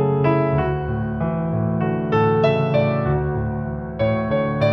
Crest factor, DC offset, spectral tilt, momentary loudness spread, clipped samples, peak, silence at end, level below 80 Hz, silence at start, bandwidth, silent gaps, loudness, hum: 16 dB; under 0.1%; -10 dB/octave; 6 LU; under 0.1%; -4 dBFS; 0 s; -38 dBFS; 0 s; 5.8 kHz; none; -20 LUFS; none